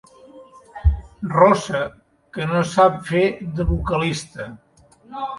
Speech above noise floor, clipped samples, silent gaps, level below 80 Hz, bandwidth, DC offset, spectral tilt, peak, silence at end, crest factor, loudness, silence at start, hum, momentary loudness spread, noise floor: 26 dB; under 0.1%; none; -30 dBFS; 11.5 kHz; under 0.1%; -6 dB/octave; 0 dBFS; 0 s; 20 dB; -20 LUFS; 0.35 s; none; 19 LU; -45 dBFS